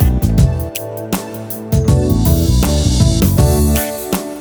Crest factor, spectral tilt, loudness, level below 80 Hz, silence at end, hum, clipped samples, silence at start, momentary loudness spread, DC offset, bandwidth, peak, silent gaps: 12 dB; -6 dB/octave; -14 LUFS; -18 dBFS; 0 s; none; under 0.1%; 0 s; 9 LU; under 0.1%; over 20 kHz; 0 dBFS; none